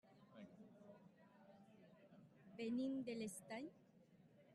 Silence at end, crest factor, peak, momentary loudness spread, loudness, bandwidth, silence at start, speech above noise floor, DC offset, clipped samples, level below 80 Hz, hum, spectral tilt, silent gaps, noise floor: 0 s; 16 dB; -36 dBFS; 23 LU; -49 LUFS; 11.5 kHz; 0.05 s; 23 dB; under 0.1%; under 0.1%; -90 dBFS; none; -5 dB/octave; none; -71 dBFS